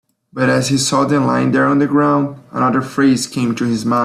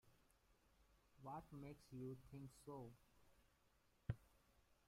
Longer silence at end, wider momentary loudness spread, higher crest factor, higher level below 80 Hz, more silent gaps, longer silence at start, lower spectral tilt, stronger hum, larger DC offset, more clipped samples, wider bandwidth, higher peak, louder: second, 0 s vs 0.15 s; about the same, 5 LU vs 6 LU; second, 12 dB vs 26 dB; first, -54 dBFS vs -72 dBFS; neither; first, 0.35 s vs 0.05 s; second, -5 dB/octave vs -7.5 dB/octave; neither; neither; neither; second, 13.5 kHz vs 16 kHz; first, -2 dBFS vs -32 dBFS; first, -15 LUFS vs -57 LUFS